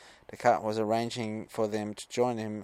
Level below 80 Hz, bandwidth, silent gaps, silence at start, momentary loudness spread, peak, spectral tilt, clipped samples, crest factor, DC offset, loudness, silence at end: -70 dBFS; 15.5 kHz; none; 0 s; 8 LU; -10 dBFS; -5.5 dB/octave; under 0.1%; 22 dB; under 0.1%; -31 LUFS; 0 s